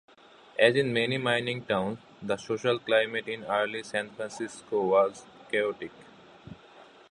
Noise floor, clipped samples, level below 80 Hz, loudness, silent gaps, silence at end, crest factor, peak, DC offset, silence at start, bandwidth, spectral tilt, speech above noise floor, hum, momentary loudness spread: -54 dBFS; under 0.1%; -68 dBFS; -28 LUFS; none; 0.3 s; 22 dB; -8 dBFS; under 0.1%; 0.55 s; 11 kHz; -5 dB/octave; 26 dB; none; 16 LU